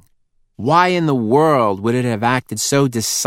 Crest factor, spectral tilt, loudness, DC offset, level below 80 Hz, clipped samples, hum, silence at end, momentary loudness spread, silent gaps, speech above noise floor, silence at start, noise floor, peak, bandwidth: 16 dB; -4.5 dB/octave; -16 LUFS; under 0.1%; -58 dBFS; under 0.1%; none; 0 s; 5 LU; none; 44 dB; 0.6 s; -59 dBFS; 0 dBFS; 16.5 kHz